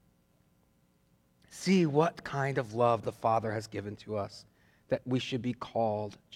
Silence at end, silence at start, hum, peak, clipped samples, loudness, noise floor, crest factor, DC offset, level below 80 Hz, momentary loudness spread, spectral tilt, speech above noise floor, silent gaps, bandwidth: 0 s; 1.5 s; none; -12 dBFS; under 0.1%; -32 LUFS; -69 dBFS; 20 dB; under 0.1%; -68 dBFS; 11 LU; -6.5 dB/octave; 38 dB; none; 13.5 kHz